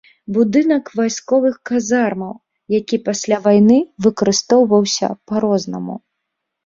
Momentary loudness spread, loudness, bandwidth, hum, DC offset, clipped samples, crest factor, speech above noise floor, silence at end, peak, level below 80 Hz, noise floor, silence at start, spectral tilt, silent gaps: 11 LU; -16 LUFS; 7.6 kHz; none; under 0.1%; under 0.1%; 16 dB; 61 dB; 0.65 s; -2 dBFS; -58 dBFS; -77 dBFS; 0.3 s; -5 dB/octave; none